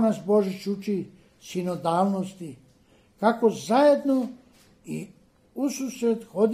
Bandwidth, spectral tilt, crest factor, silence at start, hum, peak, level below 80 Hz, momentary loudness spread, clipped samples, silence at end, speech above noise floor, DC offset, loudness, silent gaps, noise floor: 15.5 kHz; -6 dB/octave; 20 dB; 0 s; none; -6 dBFS; -68 dBFS; 17 LU; under 0.1%; 0 s; 35 dB; under 0.1%; -25 LUFS; none; -59 dBFS